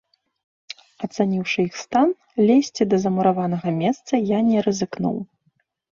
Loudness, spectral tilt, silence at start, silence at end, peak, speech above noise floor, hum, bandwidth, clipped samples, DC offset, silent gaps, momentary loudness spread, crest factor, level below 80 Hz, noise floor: -21 LUFS; -6 dB/octave; 1 s; 0.7 s; -4 dBFS; 48 dB; none; 7.2 kHz; under 0.1%; under 0.1%; none; 14 LU; 16 dB; -62 dBFS; -68 dBFS